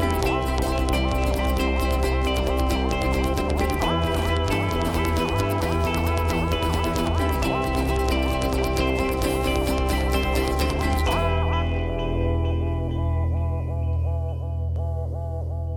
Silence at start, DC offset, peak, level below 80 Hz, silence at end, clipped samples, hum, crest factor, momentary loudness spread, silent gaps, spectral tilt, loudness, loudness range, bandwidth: 0 s; under 0.1%; -6 dBFS; -28 dBFS; 0 s; under 0.1%; none; 16 dB; 4 LU; none; -6 dB/octave; -24 LUFS; 2 LU; 17.5 kHz